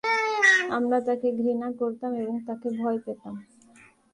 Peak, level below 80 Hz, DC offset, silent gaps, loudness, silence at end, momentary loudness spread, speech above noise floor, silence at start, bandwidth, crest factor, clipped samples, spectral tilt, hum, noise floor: -8 dBFS; -72 dBFS; under 0.1%; none; -25 LUFS; 0.7 s; 17 LU; 28 dB; 0.05 s; 11.5 kHz; 18 dB; under 0.1%; -3.5 dB/octave; none; -56 dBFS